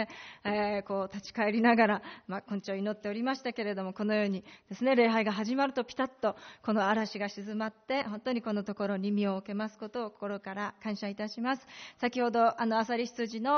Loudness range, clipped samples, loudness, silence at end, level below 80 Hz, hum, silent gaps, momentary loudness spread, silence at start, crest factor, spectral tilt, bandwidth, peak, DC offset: 4 LU; under 0.1%; -32 LUFS; 0 s; -74 dBFS; none; none; 11 LU; 0 s; 18 dB; -4 dB/octave; 6.6 kHz; -14 dBFS; under 0.1%